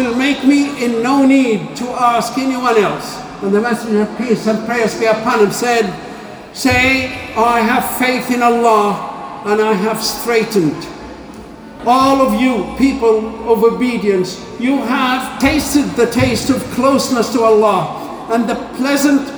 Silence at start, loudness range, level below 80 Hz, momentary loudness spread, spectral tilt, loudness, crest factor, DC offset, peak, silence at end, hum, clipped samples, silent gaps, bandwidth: 0 s; 2 LU; -42 dBFS; 11 LU; -4.5 dB/octave; -14 LUFS; 14 dB; under 0.1%; 0 dBFS; 0 s; none; under 0.1%; none; over 20 kHz